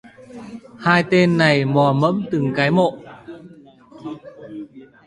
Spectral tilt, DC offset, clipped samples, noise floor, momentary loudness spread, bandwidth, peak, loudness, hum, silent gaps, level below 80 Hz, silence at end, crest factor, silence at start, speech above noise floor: -7 dB/octave; under 0.1%; under 0.1%; -45 dBFS; 24 LU; 11 kHz; 0 dBFS; -17 LUFS; none; none; -56 dBFS; 0.25 s; 20 dB; 0.3 s; 28 dB